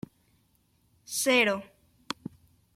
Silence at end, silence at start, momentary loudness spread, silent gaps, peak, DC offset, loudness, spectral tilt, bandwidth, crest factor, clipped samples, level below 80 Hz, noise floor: 1.15 s; 1.1 s; 22 LU; none; -10 dBFS; under 0.1%; -28 LUFS; -2 dB/octave; 16.5 kHz; 22 dB; under 0.1%; -72 dBFS; -69 dBFS